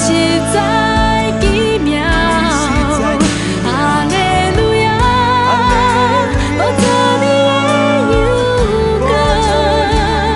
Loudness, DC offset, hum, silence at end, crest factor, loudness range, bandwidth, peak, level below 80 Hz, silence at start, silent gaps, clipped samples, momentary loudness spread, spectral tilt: -12 LUFS; under 0.1%; none; 0 s; 12 dB; 1 LU; 11.5 kHz; 0 dBFS; -22 dBFS; 0 s; none; under 0.1%; 3 LU; -5 dB/octave